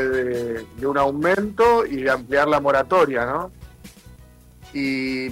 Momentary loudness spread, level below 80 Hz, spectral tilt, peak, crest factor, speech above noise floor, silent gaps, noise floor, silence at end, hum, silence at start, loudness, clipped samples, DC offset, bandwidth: 10 LU; -48 dBFS; -6 dB/octave; -6 dBFS; 14 dB; 27 dB; none; -47 dBFS; 0 s; none; 0 s; -20 LUFS; under 0.1%; under 0.1%; 16 kHz